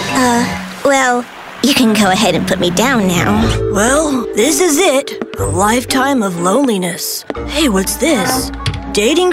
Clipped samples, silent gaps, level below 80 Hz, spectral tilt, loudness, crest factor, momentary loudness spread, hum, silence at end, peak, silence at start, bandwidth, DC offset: under 0.1%; none; -32 dBFS; -4 dB/octave; -13 LUFS; 12 dB; 8 LU; none; 0 s; -2 dBFS; 0 s; 16.5 kHz; under 0.1%